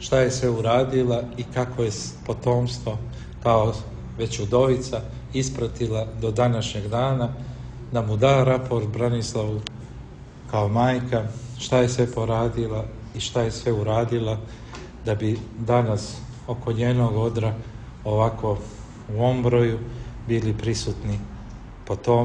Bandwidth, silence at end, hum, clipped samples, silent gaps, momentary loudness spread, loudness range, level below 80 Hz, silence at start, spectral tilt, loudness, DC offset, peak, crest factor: 9.8 kHz; 0 s; none; under 0.1%; none; 15 LU; 2 LU; -42 dBFS; 0 s; -6.5 dB/octave; -24 LUFS; under 0.1%; -4 dBFS; 18 dB